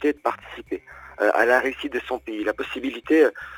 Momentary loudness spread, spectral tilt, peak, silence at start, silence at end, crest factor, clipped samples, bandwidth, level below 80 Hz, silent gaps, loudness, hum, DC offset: 15 LU; -4 dB/octave; -4 dBFS; 0 s; 0 s; 18 dB; under 0.1%; 19 kHz; -56 dBFS; none; -23 LUFS; none; under 0.1%